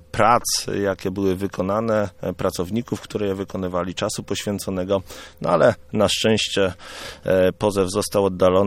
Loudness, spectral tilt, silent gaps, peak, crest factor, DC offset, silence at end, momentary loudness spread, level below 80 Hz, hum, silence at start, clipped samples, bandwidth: -22 LUFS; -4.5 dB/octave; none; -2 dBFS; 20 dB; under 0.1%; 0 s; 9 LU; -48 dBFS; none; 0.15 s; under 0.1%; 16 kHz